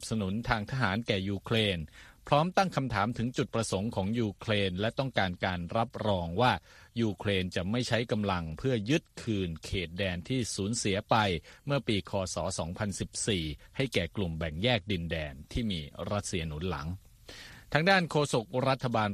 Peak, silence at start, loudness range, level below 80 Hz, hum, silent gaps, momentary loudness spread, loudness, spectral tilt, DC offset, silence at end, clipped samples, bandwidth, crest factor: -8 dBFS; 0 s; 3 LU; -50 dBFS; none; none; 8 LU; -31 LUFS; -5 dB/octave; under 0.1%; 0 s; under 0.1%; 14 kHz; 24 dB